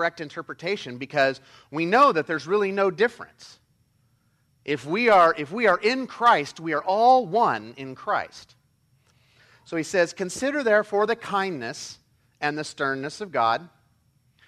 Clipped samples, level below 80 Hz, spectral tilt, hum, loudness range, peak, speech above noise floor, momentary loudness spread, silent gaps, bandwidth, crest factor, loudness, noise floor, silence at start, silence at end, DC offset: under 0.1%; -68 dBFS; -4.5 dB/octave; none; 6 LU; -6 dBFS; 43 dB; 16 LU; none; 13.5 kHz; 18 dB; -23 LUFS; -66 dBFS; 0 s; 0.8 s; under 0.1%